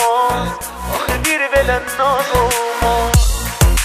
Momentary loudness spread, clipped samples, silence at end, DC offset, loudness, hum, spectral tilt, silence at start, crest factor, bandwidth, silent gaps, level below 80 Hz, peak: 7 LU; under 0.1%; 0 s; under 0.1%; -16 LUFS; none; -4 dB/octave; 0 s; 16 dB; 15.5 kHz; none; -22 dBFS; 0 dBFS